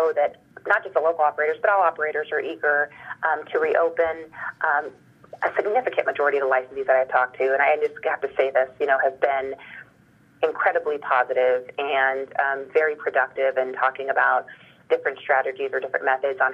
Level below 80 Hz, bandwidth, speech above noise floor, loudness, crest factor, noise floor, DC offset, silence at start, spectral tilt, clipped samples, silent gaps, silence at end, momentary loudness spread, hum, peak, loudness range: -70 dBFS; 5.8 kHz; 33 dB; -23 LUFS; 16 dB; -56 dBFS; under 0.1%; 0 s; -5 dB/octave; under 0.1%; none; 0 s; 7 LU; none; -6 dBFS; 2 LU